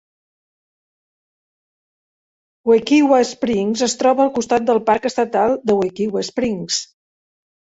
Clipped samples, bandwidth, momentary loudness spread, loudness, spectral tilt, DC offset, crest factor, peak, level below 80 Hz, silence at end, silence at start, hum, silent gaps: under 0.1%; 8 kHz; 8 LU; -17 LUFS; -4 dB/octave; under 0.1%; 18 dB; -2 dBFS; -58 dBFS; 0.9 s; 2.65 s; none; none